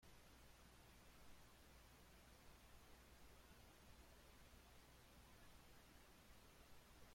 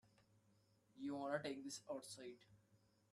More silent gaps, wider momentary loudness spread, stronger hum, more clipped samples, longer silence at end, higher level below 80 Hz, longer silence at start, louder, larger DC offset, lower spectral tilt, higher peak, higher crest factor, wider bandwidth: neither; second, 1 LU vs 12 LU; first, 60 Hz at -75 dBFS vs none; neither; second, 0 s vs 0.35 s; first, -72 dBFS vs under -90 dBFS; about the same, 0 s vs 0.05 s; second, -68 LUFS vs -49 LUFS; neither; about the same, -3.5 dB/octave vs -4 dB/octave; second, -52 dBFS vs -28 dBFS; second, 14 dB vs 24 dB; first, 16.5 kHz vs 13 kHz